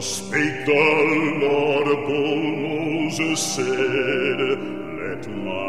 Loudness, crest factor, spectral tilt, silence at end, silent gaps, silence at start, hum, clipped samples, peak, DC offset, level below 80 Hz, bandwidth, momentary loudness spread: -21 LUFS; 16 dB; -4 dB/octave; 0 s; none; 0 s; none; under 0.1%; -6 dBFS; 0.7%; -60 dBFS; 14.5 kHz; 12 LU